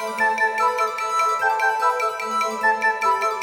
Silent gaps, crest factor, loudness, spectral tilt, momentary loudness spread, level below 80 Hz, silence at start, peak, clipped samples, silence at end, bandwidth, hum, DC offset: none; 14 dB; -20 LUFS; -1 dB/octave; 4 LU; -72 dBFS; 0 s; -8 dBFS; under 0.1%; 0 s; 20 kHz; none; under 0.1%